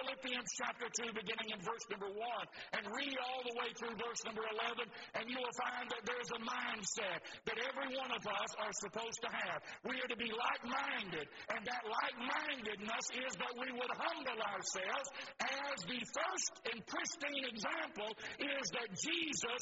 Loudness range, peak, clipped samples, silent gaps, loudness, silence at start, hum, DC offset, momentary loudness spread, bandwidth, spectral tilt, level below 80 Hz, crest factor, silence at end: 2 LU; -22 dBFS; under 0.1%; none; -41 LUFS; 0 s; none; under 0.1%; 5 LU; 8 kHz; -0.5 dB/octave; -78 dBFS; 20 dB; 0 s